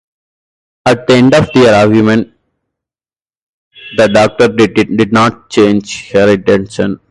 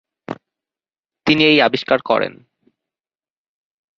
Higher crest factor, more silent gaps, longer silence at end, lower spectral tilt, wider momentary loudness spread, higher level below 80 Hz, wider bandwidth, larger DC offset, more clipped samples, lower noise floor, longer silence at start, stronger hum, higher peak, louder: second, 10 dB vs 20 dB; first, 3.37-3.71 s vs none; second, 0.15 s vs 1.7 s; about the same, -6 dB/octave vs -5.5 dB/octave; second, 9 LU vs 21 LU; first, -42 dBFS vs -60 dBFS; first, 11.5 kHz vs 7.2 kHz; neither; neither; about the same, under -90 dBFS vs under -90 dBFS; first, 0.85 s vs 0.3 s; neither; about the same, 0 dBFS vs -2 dBFS; first, -9 LUFS vs -15 LUFS